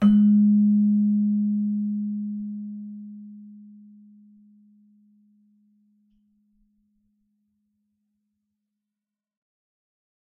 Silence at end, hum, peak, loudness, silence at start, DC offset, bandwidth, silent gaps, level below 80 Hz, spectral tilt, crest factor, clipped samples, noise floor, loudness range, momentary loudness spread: 6.6 s; none; -10 dBFS; -22 LUFS; 0 s; under 0.1%; 3.2 kHz; none; -64 dBFS; -12 dB/octave; 16 dB; under 0.1%; -88 dBFS; 24 LU; 24 LU